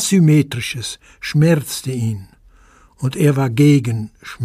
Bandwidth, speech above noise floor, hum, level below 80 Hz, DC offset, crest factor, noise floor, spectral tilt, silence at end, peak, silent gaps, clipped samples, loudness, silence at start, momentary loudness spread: 15.5 kHz; 33 dB; none; -50 dBFS; under 0.1%; 14 dB; -49 dBFS; -6 dB/octave; 0 s; -2 dBFS; none; under 0.1%; -17 LUFS; 0 s; 14 LU